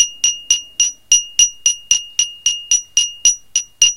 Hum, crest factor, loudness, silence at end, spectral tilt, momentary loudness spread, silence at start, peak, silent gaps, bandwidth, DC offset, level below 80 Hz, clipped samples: none; 16 dB; -14 LUFS; 0 s; 5.5 dB/octave; 6 LU; 0 s; 0 dBFS; none; 17 kHz; under 0.1%; -52 dBFS; under 0.1%